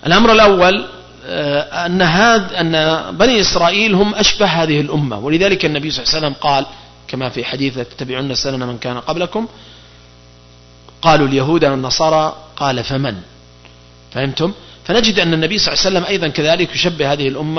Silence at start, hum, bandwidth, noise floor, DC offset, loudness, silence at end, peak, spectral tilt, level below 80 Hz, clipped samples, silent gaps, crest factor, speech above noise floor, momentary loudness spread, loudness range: 0 s; 60 Hz at -45 dBFS; 6.4 kHz; -43 dBFS; under 0.1%; -14 LUFS; 0 s; 0 dBFS; -4.5 dB/octave; -38 dBFS; under 0.1%; none; 16 dB; 28 dB; 11 LU; 8 LU